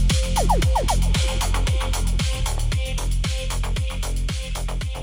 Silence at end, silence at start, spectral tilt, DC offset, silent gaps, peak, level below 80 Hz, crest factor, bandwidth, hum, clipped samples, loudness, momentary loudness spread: 0 s; 0 s; -4 dB/octave; under 0.1%; none; -8 dBFS; -22 dBFS; 14 dB; 16.5 kHz; none; under 0.1%; -24 LUFS; 7 LU